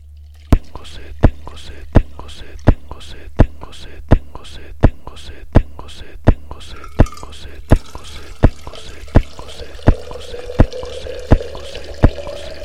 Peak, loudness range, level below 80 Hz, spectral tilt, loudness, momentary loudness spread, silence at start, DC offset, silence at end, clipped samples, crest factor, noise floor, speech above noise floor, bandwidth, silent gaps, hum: 0 dBFS; 1 LU; -20 dBFS; -7.5 dB/octave; -19 LUFS; 18 LU; 0.15 s; 3%; 0 s; under 0.1%; 16 dB; -38 dBFS; 22 dB; 11 kHz; none; none